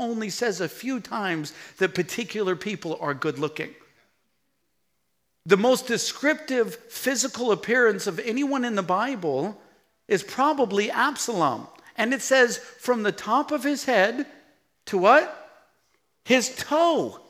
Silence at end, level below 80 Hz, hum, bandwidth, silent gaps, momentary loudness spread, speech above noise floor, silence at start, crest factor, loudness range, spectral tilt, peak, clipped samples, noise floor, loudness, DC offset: 0.1 s; -74 dBFS; none; 16.5 kHz; none; 11 LU; 52 dB; 0 s; 20 dB; 5 LU; -3.5 dB/octave; -4 dBFS; under 0.1%; -76 dBFS; -24 LUFS; under 0.1%